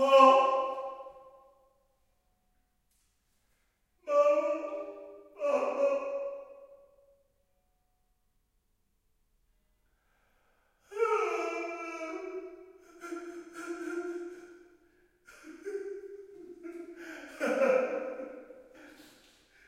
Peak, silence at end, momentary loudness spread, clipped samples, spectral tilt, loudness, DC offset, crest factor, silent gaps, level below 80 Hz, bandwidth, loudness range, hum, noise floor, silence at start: -6 dBFS; 0.65 s; 22 LU; under 0.1%; -3 dB/octave; -30 LUFS; under 0.1%; 26 dB; none; -76 dBFS; 12.5 kHz; 12 LU; none; -75 dBFS; 0 s